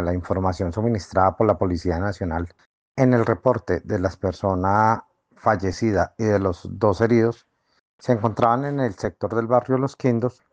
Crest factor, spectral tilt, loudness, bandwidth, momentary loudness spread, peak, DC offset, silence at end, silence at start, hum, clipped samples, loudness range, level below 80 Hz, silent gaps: 18 dB; -8 dB/octave; -22 LUFS; 8.8 kHz; 7 LU; -4 dBFS; under 0.1%; 0.2 s; 0 s; none; under 0.1%; 1 LU; -50 dBFS; 2.66-2.95 s, 7.80-7.99 s